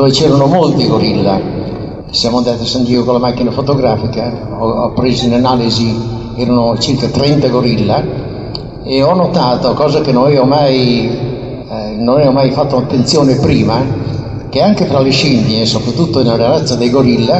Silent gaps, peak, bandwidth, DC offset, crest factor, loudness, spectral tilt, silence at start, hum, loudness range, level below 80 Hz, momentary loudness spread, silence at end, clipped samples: none; 0 dBFS; 8.4 kHz; under 0.1%; 10 dB; -12 LUFS; -6.5 dB/octave; 0 s; none; 2 LU; -34 dBFS; 10 LU; 0 s; under 0.1%